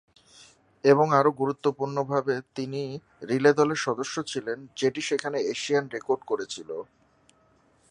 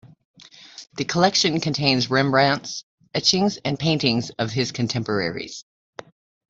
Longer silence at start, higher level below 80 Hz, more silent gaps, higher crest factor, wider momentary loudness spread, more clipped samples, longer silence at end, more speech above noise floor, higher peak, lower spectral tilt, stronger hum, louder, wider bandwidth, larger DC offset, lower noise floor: first, 0.85 s vs 0.05 s; second, -72 dBFS vs -58 dBFS; second, none vs 0.25-0.34 s, 2.83-2.98 s; about the same, 22 dB vs 20 dB; second, 14 LU vs 17 LU; neither; first, 1.05 s vs 0.9 s; first, 37 dB vs 23 dB; about the same, -4 dBFS vs -2 dBFS; about the same, -5 dB/octave vs -4 dB/octave; neither; second, -26 LUFS vs -21 LUFS; first, 10.5 kHz vs 8 kHz; neither; first, -63 dBFS vs -44 dBFS